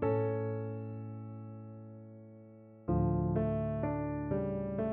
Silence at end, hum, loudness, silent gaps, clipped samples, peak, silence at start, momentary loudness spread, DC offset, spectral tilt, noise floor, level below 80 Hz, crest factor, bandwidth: 0 s; none; -35 LUFS; none; under 0.1%; -20 dBFS; 0 s; 20 LU; under 0.1%; -10.5 dB/octave; -54 dBFS; -50 dBFS; 14 dB; 3.5 kHz